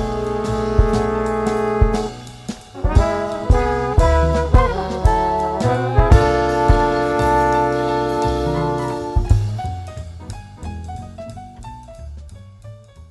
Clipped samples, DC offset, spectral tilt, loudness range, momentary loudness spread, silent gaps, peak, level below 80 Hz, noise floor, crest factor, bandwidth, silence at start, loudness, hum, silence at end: under 0.1%; under 0.1%; -7 dB/octave; 9 LU; 18 LU; none; 0 dBFS; -22 dBFS; -39 dBFS; 18 dB; 12 kHz; 0 s; -18 LUFS; none; 0.05 s